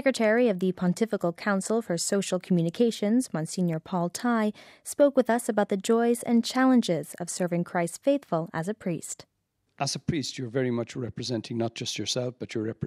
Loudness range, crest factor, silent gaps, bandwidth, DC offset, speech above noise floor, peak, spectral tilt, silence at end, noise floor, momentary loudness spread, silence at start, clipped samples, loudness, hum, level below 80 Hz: 6 LU; 16 dB; none; 15.5 kHz; under 0.1%; 49 dB; -10 dBFS; -5 dB/octave; 0 s; -76 dBFS; 10 LU; 0 s; under 0.1%; -27 LUFS; none; -66 dBFS